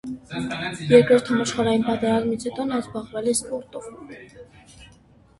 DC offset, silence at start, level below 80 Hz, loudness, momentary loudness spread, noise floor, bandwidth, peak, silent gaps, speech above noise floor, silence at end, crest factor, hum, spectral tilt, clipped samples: under 0.1%; 0.05 s; -54 dBFS; -22 LUFS; 21 LU; -53 dBFS; 12 kHz; 0 dBFS; none; 31 dB; 0.55 s; 22 dB; none; -5 dB/octave; under 0.1%